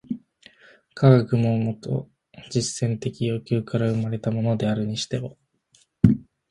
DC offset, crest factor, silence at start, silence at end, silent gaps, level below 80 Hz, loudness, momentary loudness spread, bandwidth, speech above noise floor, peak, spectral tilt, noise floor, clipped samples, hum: under 0.1%; 24 dB; 0.1 s; 0.3 s; none; -48 dBFS; -23 LUFS; 12 LU; 11 kHz; 40 dB; 0 dBFS; -7 dB/octave; -62 dBFS; under 0.1%; none